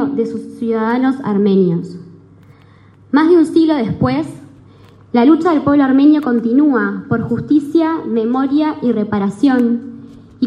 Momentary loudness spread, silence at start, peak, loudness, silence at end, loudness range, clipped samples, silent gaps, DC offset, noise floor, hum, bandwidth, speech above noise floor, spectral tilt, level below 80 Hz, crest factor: 10 LU; 0 s; -2 dBFS; -14 LUFS; 0 s; 3 LU; under 0.1%; none; under 0.1%; -44 dBFS; none; 11 kHz; 31 dB; -8 dB/octave; -54 dBFS; 14 dB